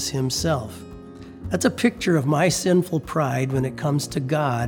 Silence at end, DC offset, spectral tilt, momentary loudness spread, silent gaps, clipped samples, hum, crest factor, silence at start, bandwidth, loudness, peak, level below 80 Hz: 0 s; under 0.1%; -5 dB/octave; 18 LU; none; under 0.1%; none; 18 dB; 0 s; 19.5 kHz; -22 LUFS; -4 dBFS; -48 dBFS